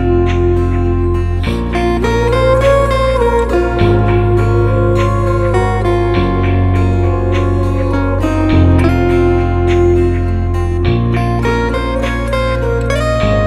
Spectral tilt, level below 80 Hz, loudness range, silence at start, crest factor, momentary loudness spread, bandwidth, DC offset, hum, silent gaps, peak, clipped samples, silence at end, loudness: -8 dB/octave; -20 dBFS; 2 LU; 0 s; 12 dB; 5 LU; 11.5 kHz; under 0.1%; none; none; 0 dBFS; under 0.1%; 0 s; -13 LUFS